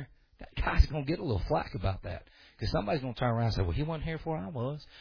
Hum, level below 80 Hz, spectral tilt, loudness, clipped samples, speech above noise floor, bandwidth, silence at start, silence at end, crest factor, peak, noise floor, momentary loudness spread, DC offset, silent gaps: none; -36 dBFS; -7.5 dB/octave; -33 LUFS; under 0.1%; 21 dB; 5.4 kHz; 0 s; 0 s; 24 dB; -8 dBFS; -52 dBFS; 11 LU; under 0.1%; none